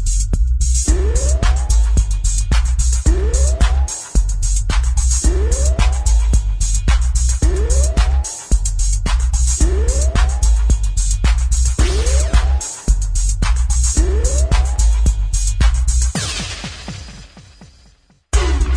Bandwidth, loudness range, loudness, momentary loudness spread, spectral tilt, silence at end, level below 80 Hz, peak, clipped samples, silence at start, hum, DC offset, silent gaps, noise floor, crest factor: 11 kHz; 2 LU; -17 LUFS; 4 LU; -4 dB/octave; 0 s; -14 dBFS; -2 dBFS; under 0.1%; 0 s; none; under 0.1%; none; -51 dBFS; 12 dB